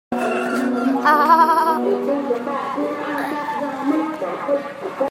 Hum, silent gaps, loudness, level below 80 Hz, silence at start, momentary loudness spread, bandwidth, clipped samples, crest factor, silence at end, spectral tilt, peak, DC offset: none; none; -19 LUFS; -70 dBFS; 0.1 s; 11 LU; 16.5 kHz; under 0.1%; 18 dB; 0 s; -5 dB/octave; -2 dBFS; under 0.1%